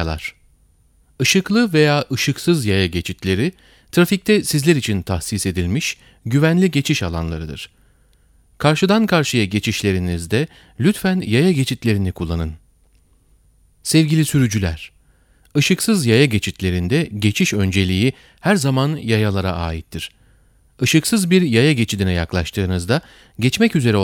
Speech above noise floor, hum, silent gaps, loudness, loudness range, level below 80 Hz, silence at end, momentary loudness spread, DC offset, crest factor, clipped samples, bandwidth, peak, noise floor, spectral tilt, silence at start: 38 dB; none; none; -18 LUFS; 3 LU; -40 dBFS; 0 s; 10 LU; under 0.1%; 18 dB; under 0.1%; 18 kHz; 0 dBFS; -55 dBFS; -5 dB/octave; 0 s